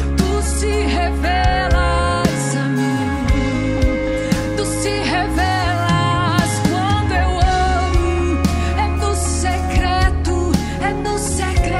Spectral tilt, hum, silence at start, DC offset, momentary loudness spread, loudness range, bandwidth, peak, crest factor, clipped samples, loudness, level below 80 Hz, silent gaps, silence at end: -5 dB/octave; none; 0 s; under 0.1%; 3 LU; 2 LU; 15 kHz; -2 dBFS; 16 dB; under 0.1%; -18 LUFS; -22 dBFS; none; 0 s